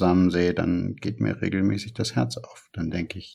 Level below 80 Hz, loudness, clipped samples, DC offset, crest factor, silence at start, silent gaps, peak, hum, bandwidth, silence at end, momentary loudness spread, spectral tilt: -56 dBFS; -25 LUFS; under 0.1%; under 0.1%; 16 dB; 0 s; none; -8 dBFS; none; 12 kHz; 0 s; 11 LU; -6.5 dB/octave